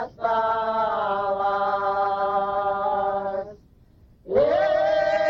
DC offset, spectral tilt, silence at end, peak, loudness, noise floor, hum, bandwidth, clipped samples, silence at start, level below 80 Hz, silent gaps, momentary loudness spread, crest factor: under 0.1%; -6 dB/octave; 0 s; -8 dBFS; -23 LUFS; -54 dBFS; none; 6.8 kHz; under 0.1%; 0 s; -54 dBFS; none; 5 LU; 14 dB